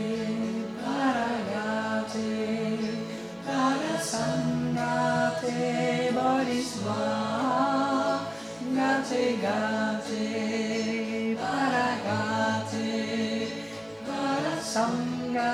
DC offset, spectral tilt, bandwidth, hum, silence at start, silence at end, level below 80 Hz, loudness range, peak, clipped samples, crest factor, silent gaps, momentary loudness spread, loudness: under 0.1%; -5 dB/octave; 14 kHz; none; 0 s; 0 s; -66 dBFS; 2 LU; -12 dBFS; under 0.1%; 16 dB; none; 6 LU; -28 LUFS